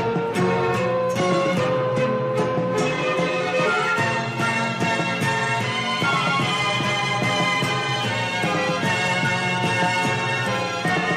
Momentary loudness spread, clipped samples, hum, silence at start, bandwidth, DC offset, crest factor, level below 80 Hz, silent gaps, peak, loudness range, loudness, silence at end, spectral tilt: 2 LU; under 0.1%; none; 0 s; 15 kHz; under 0.1%; 12 dB; -56 dBFS; none; -10 dBFS; 1 LU; -21 LUFS; 0 s; -4.5 dB/octave